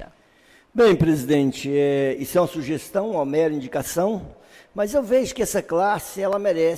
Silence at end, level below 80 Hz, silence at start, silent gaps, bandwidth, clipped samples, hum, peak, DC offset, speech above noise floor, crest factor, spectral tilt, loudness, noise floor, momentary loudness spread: 0 s; -50 dBFS; 0 s; none; 16 kHz; under 0.1%; none; -10 dBFS; under 0.1%; 34 dB; 12 dB; -5.5 dB/octave; -22 LUFS; -55 dBFS; 8 LU